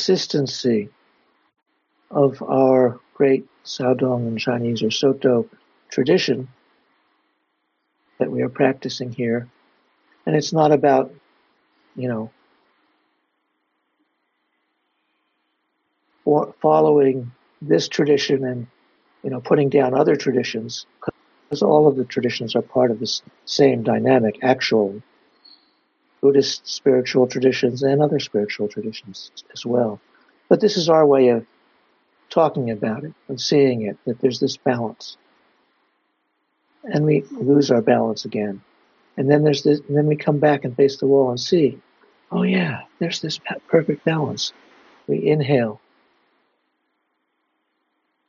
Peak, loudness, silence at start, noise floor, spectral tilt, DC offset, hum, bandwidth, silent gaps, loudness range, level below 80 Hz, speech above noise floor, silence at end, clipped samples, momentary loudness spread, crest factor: -2 dBFS; -19 LUFS; 0 s; -72 dBFS; -5 dB/octave; under 0.1%; none; 7.2 kHz; none; 6 LU; -68 dBFS; 53 dB; 2.55 s; under 0.1%; 14 LU; 20 dB